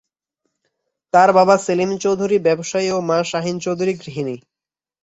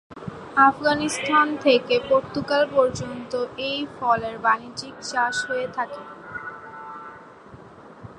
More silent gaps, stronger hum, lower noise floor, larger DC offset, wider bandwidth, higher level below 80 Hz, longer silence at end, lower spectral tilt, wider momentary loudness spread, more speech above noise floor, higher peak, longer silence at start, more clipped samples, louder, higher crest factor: neither; neither; first, -75 dBFS vs -45 dBFS; neither; second, 8.2 kHz vs 11.5 kHz; about the same, -62 dBFS vs -58 dBFS; first, 0.65 s vs 0 s; first, -5 dB/octave vs -3.5 dB/octave; second, 13 LU vs 19 LU; first, 58 dB vs 23 dB; about the same, -2 dBFS vs -4 dBFS; first, 1.15 s vs 0.1 s; neither; first, -18 LUFS vs -22 LUFS; about the same, 18 dB vs 20 dB